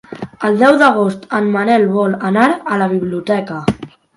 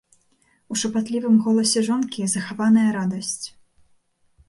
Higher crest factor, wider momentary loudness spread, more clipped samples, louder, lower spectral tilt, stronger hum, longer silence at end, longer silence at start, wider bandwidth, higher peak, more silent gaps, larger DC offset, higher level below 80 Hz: about the same, 14 dB vs 14 dB; about the same, 10 LU vs 11 LU; neither; first, -14 LUFS vs -21 LUFS; first, -7 dB/octave vs -4 dB/octave; neither; second, 0.3 s vs 1 s; second, 0.1 s vs 0.7 s; about the same, 11.5 kHz vs 11.5 kHz; first, 0 dBFS vs -8 dBFS; neither; neither; first, -50 dBFS vs -66 dBFS